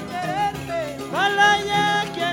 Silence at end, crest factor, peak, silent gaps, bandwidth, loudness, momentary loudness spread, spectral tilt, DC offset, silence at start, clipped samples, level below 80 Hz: 0 s; 16 dB; -6 dBFS; none; 17 kHz; -21 LUFS; 11 LU; -3.5 dB/octave; under 0.1%; 0 s; under 0.1%; -50 dBFS